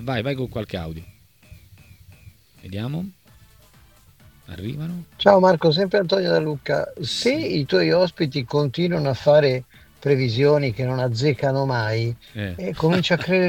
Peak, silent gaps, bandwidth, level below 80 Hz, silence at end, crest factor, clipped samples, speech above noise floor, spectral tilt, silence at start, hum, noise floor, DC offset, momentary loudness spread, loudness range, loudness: 0 dBFS; none; 18 kHz; -52 dBFS; 0 s; 22 dB; under 0.1%; 32 dB; -6.5 dB/octave; 0 s; none; -52 dBFS; under 0.1%; 15 LU; 16 LU; -21 LUFS